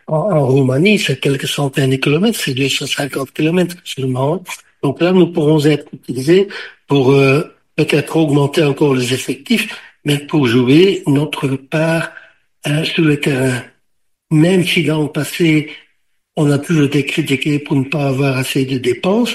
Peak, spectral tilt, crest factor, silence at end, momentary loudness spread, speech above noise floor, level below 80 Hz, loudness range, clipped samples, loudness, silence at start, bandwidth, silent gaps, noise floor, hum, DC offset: 0 dBFS; -6 dB/octave; 14 dB; 0 s; 9 LU; 52 dB; -54 dBFS; 2 LU; under 0.1%; -15 LUFS; 0.1 s; 15 kHz; none; -66 dBFS; none; 0.1%